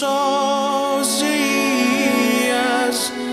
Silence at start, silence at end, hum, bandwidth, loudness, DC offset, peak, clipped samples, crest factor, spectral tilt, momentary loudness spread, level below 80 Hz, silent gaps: 0 s; 0 s; none; 16 kHz; -18 LUFS; under 0.1%; -6 dBFS; under 0.1%; 12 dB; -2 dB/octave; 2 LU; -62 dBFS; none